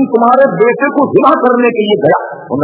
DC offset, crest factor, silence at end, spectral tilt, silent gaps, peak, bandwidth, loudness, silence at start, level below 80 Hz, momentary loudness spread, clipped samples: under 0.1%; 10 dB; 0 s; -10 dB/octave; none; 0 dBFS; 4 kHz; -10 LUFS; 0 s; -54 dBFS; 4 LU; 0.8%